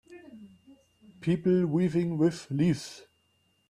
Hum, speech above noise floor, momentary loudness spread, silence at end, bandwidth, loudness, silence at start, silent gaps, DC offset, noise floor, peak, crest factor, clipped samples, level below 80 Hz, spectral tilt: none; 44 dB; 22 LU; 0.7 s; 11.5 kHz; -28 LUFS; 0.1 s; none; under 0.1%; -71 dBFS; -14 dBFS; 16 dB; under 0.1%; -64 dBFS; -7.5 dB/octave